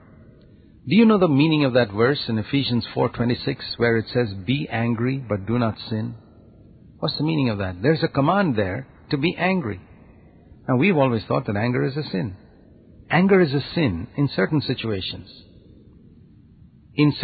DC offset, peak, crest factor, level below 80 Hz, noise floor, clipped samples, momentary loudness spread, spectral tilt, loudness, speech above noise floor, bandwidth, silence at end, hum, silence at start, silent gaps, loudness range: under 0.1%; -4 dBFS; 18 dB; -48 dBFS; -50 dBFS; under 0.1%; 11 LU; -11.5 dB/octave; -22 LUFS; 29 dB; 4.9 kHz; 0 s; none; 0.85 s; none; 5 LU